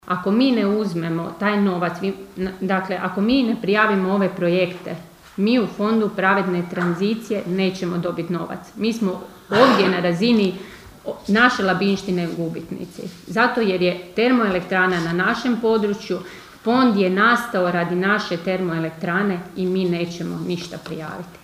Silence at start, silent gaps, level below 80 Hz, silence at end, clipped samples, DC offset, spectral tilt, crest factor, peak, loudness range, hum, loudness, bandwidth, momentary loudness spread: 0.05 s; none; -56 dBFS; 0.05 s; under 0.1%; under 0.1%; -6 dB/octave; 20 dB; 0 dBFS; 3 LU; none; -20 LUFS; 15.5 kHz; 14 LU